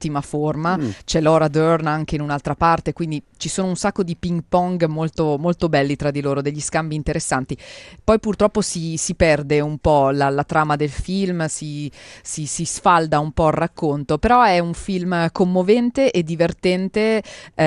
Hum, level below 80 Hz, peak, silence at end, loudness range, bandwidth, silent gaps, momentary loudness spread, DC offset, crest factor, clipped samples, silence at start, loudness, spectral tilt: none; -40 dBFS; -2 dBFS; 0 s; 3 LU; 12 kHz; none; 9 LU; under 0.1%; 18 dB; under 0.1%; 0 s; -19 LUFS; -5.5 dB/octave